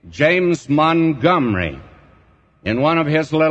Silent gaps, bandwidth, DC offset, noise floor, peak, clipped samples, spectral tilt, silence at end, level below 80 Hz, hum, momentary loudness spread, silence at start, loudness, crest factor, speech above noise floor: none; 8.4 kHz; under 0.1%; -53 dBFS; -2 dBFS; under 0.1%; -7 dB/octave; 0 s; -46 dBFS; none; 8 LU; 0.05 s; -17 LUFS; 16 dB; 37 dB